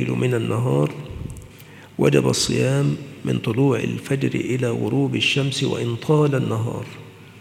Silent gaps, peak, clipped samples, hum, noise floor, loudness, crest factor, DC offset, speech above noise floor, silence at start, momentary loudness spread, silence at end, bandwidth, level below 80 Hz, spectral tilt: none; -2 dBFS; under 0.1%; none; -43 dBFS; -21 LUFS; 18 dB; under 0.1%; 23 dB; 0 s; 15 LU; 0 s; 15 kHz; -50 dBFS; -5.5 dB/octave